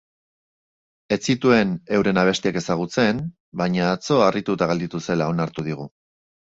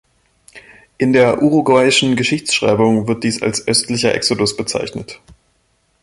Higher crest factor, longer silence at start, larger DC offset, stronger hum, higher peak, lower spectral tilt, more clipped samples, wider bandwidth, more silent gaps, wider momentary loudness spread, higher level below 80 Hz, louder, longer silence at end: about the same, 20 dB vs 16 dB; first, 1.1 s vs 0.55 s; neither; neither; about the same, -2 dBFS vs 0 dBFS; first, -5.5 dB/octave vs -4 dB/octave; neither; second, 8 kHz vs 12 kHz; first, 3.40-3.52 s vs none; about the same, 10 LU vs 9 LU; about the same, -54 dBFS vs -50 dBFS; second, -21 LUFS vs -15 LUFS; second, 0.7 s vs 0.85 s